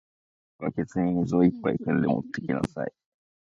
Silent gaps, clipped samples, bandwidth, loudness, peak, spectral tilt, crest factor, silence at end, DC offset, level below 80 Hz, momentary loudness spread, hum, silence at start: none; under 0.1%; 8.4 kHz; -27 LUFS; -8 dBFS; -8.5 dB/octave; 18 dB; 0.55 s; under 0.1%; -56 dBFS; 11 LU; none; 0.6 s